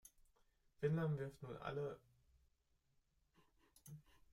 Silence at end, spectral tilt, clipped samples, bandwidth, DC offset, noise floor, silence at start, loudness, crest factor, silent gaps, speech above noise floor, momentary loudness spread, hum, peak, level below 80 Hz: 0.35 s; -7.5 dB/octave; under 0.1%; 15 kHz; under 0.1%; -81 dBFS; 0.05 s; -45 LUFS; 22 dB; none; 38 dB; 20 LU; none; -28 dBFS; -74 dBFS